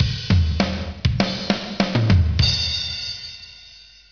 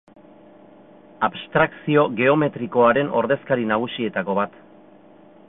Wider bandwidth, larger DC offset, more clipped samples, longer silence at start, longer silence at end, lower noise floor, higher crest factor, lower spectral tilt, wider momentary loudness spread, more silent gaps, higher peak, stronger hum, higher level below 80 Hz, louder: first, 5.4 kHz vs 4 kHz; neither; neither; second, 0 s vs 1.2 s; second, 0.3 s vs 1 s; second, -45 dBFS vs -49 dBFS; about the same, 20 dB vs 18 dB; second, -5.5 dB/octave vs -10.5 dB/octave; first, 15 LU vs 8 LU; neither; about the same, -2 dBFS vs -4 dBFS; neither; first, -30 dBFS vs -60 dBFS; about the same, -20 LUFS vs -21 LUFS